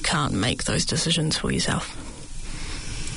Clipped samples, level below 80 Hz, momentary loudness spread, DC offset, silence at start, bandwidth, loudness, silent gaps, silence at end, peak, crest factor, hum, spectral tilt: under 0.1%; -36 dBFS; 16 LU; under 0.1%; 0 s; 11 kHz; -24 LUFS; none; 0 s; -10 dBFS; 14 dB; none; -3.5 dB/octave